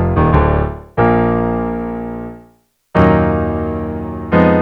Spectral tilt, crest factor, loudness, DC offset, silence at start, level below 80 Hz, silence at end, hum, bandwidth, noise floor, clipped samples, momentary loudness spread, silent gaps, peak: -10 dB/octave; 14 dB; -15 LUFS; under 0.1%; 0 s; -26 dBFS; 0 s; 60 Hz at -45 dBFS; 5.4 kHz; -52 dBFS; under 0.1%; 12 LU; none; 0 dBFS